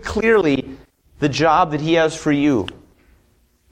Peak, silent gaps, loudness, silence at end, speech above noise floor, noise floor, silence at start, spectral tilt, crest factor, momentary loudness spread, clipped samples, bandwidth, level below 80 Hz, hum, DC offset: -2 dBFS; none; -17 LUFS; 1 s; 42 dB; -59 dBFS; 0 s; -5.5 dB/octave; 16 dB; 8 LU; under 0.1%; 10.5 kHz; -44 dBFS; none; under 0.1%